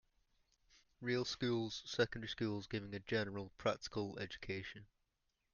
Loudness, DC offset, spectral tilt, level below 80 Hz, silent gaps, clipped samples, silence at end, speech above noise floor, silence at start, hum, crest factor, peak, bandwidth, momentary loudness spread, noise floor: -42 LUFS; under 0.1%; -5 dB/octave; -68 dBFS; none; under 0.1%; 0.7 s; 43 dB; 1 s; none; 22 dB; -22 dBFS; 7.2 kHz; 8 LU; -85 dBFS